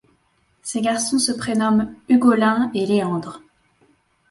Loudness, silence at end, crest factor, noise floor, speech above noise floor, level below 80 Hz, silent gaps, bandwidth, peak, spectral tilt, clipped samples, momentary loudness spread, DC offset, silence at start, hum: -19 LUFS; 0.9 s; 18 dB; -63 dBFS; 44 dB; -58 dBFS; none; 11.5 kHz; -4 dBFS; -4.5 dB/octave; under 0.1%; 12 LU; under 0.1%; 0.65 s; none